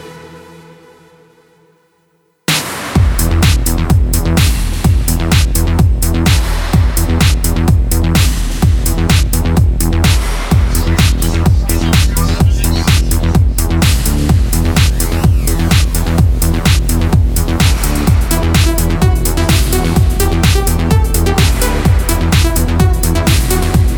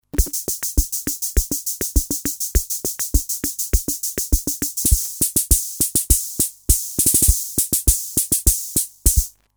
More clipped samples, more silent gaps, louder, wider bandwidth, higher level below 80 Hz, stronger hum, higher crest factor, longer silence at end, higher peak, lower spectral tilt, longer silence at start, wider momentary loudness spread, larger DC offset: neither; neither; first, -12 LUFS vs -19 LUFS; about the same, over 20 kHz vs over 20 kHz; first, -14 dBFS vs -24 dBFS; neither; second, 10 dB vs 20 dB; second, 0 s vs 0.25 s; about the same, 0 dBFS vs 0 dBFS; first, -5 dB/octave vs -3 dB/octave; second, 0 s vs 0.15 s; second, 2 LU vs 7 LU; neither